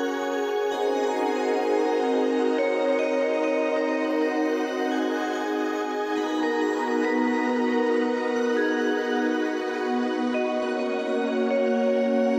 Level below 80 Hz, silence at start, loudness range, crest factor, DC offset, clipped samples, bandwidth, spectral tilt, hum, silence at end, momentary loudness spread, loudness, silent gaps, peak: -74 dBFS; 0 s; 2 LU; 12 dB; under 0.1%; under 0.1%; 14 kHz; -4 dB/octave; none; 0 s; 3 LU; -25 LUFS; none; -12 dBFS